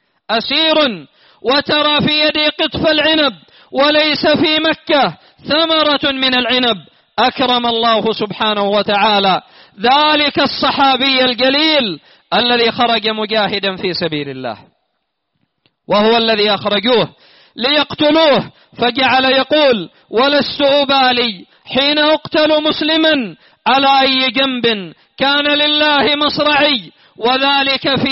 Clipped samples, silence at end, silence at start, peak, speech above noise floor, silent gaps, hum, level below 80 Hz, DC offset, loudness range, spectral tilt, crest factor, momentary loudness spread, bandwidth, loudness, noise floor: under 0.1%; 0 s; 0.3 s; 0 dBFS; 57 dB; none; none; -52 dBFS; under 0.1%; 4 LU; -1 dB/octave; 14 dB; 8 LU; 6 kHz; -13 LUFS; -70 dBFS